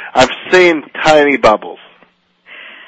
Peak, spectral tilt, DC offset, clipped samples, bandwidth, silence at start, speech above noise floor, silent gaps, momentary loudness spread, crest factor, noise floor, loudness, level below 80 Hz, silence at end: 0 dBFS; -4 dB/octave; under 0.1%; 0.3%; 9.4 kHz; 0 s; 41 dB; none; 7 LU; 12 dB; -52 dBFS; -10 LUFS; -44 dBFS; 0.2 s